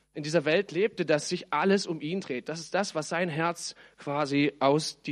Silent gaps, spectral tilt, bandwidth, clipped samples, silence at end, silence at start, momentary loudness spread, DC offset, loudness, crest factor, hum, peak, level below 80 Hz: none; -4.5 dB/octave; 12.5 kHz; under 0.1%; 0 s; 0.15 s; 9 LU; under 0.1%; -28 LUFS; 18 dB; none; -10 dBFS; -74 dBFS